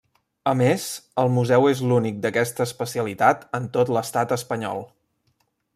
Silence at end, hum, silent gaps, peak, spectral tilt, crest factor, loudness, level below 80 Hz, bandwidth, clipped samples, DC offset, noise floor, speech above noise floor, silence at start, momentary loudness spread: 0.9 s; none; none; -4 dBFS; -5.5 dB/octave; 20 dB; -22 LUFS; -64 dBFS; 15.5 kHz; under 0.1%; under 0.1%; -69 dBFS; 48 dB; 0.45 s; 9 LU